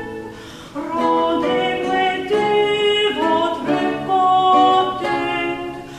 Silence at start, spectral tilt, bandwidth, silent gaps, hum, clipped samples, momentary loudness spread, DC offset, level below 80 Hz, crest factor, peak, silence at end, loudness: 0 s; -4.5 dB/octave; 12.5 kHz; none; none; under 0.1%; 15 LU; under 0.1%; -52 dBFS; 14 dB; -4 dBFS; 0 s; -17 LUFS